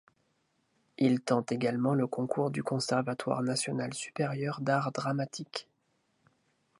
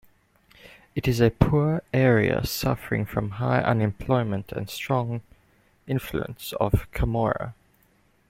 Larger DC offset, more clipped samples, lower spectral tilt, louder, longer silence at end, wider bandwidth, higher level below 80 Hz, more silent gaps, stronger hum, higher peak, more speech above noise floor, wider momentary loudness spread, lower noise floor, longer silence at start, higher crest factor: neither; neither; about the same, -5.5 dB/octave vs -6.5 dB/octave; second, -32 LUFS vs -25 LUFS; first, 1.15 s vs 0.75 s; second, 11.5 kHz vs 16.5 kHz; second, -76 dBFS vs -40 dBFS; neither; neither; second, -12 dBFS vs -2 dBFS; first, 44 dB vs 39 dB; second, 6 LU vs 11 LU; first, -75 dBFS vs -63 dBFS; first, 1 s vs 0.65 s; about the same, 20 dB vs 22 dB